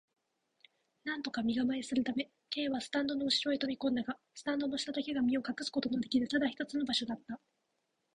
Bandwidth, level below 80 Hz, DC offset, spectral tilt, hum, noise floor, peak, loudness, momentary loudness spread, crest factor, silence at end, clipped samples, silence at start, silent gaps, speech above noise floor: 10.5 kHz; -70 dBFS; under 0.1%; -3.5 dB/octave; none; -82 dBFS; -18 dBFS; -35 LUFS; 9 LU; 18 dB; 0.8 s; under 0.1%; 1.05 s; none; 47 dB